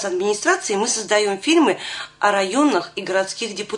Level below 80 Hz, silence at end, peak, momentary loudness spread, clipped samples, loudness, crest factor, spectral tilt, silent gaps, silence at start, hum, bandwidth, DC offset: -66 dBFS; 0 s; -4 dBFS; 8 LU; under 0.1%; -19 LUFS; 16 dB; -2.5 dB/octave; none; 0 s; none; 11 kHz; under 0.1%